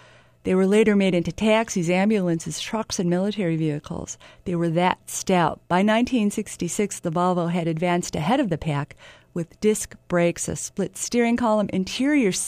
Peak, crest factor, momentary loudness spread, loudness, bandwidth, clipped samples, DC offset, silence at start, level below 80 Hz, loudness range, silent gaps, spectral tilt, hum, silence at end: -4 dBFS; 18 dB; 9 LU; -23 LUFS; 15.5 kHz; under 0.1%; under 0.1%; 0.45 s; -52 dBFS; 3 LU; none; -5 dB/octave; none; 0 s